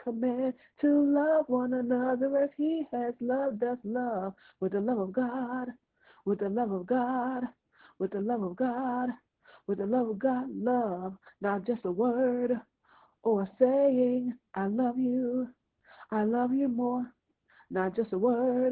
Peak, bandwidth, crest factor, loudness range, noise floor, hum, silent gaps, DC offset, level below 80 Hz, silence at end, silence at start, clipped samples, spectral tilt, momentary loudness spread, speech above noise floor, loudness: -12 dBFS; 4.1 kHz; 18 dB; 4 LU; -64 dBFS; none; none; under 0.1%; -72 dBFS; 0 s; 0 s; under 0.1%; -11.5 dB/octave; 10 LU; 35 dB; -30 LUFS